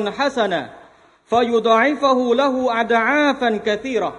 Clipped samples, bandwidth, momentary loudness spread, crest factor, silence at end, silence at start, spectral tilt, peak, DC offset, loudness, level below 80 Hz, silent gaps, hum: under 0.1%; 10.5 kHz; 6 LU; 16 dB; 0 s; 0 s; -4.5 dB/octave; -2 dBFS; under 0.1%; -18 LUFS; -58 dBFS; none; none